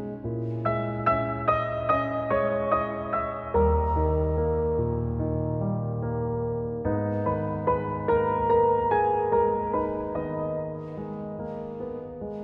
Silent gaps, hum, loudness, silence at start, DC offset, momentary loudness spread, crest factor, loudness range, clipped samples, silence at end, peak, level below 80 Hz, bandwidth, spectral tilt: none; none; -27 LUFS; 0 s; under 0.1%; 11 LU; 16 dB; 3 LU; under 0.1%; 0 s; -10 dBFS; -38 dBFS; 4.7 kHz; -11 dB/octave